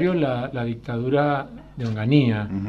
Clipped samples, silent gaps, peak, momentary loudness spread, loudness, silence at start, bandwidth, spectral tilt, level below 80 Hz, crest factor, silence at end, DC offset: under 0.1%; none; -6 dBFS; 10 LU; -23 LUFS; 0 s; 6.8 kHz; -9 dB/octave; -50 dBFS; 16 dB; 0 s; under 0.1%